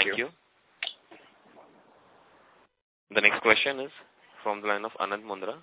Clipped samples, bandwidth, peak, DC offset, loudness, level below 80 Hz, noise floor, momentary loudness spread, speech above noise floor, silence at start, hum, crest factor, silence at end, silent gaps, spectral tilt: under 0.1%; 4 kHz; -4 dBFS; under 0.1%; -27 LUFS; -72 dBFS; -61 dBFS; 15 LU; 33 dB; 0 s; none; 28 dB; 0.05 s; 2.82-3.07 s; 0.5 dB/octave